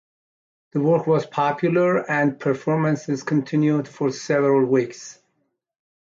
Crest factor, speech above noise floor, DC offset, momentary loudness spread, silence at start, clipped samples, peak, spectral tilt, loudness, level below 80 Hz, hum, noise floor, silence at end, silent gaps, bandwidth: 14 dB; 52 dB; under 0.1%; 7 LU; 0.75 s; under 0.1%; -8 dBFS; -7 dB/octave; -21 LUFS; -68 dBFS; none; -72 dBFS; 0.9 s; none; 7.6 kHz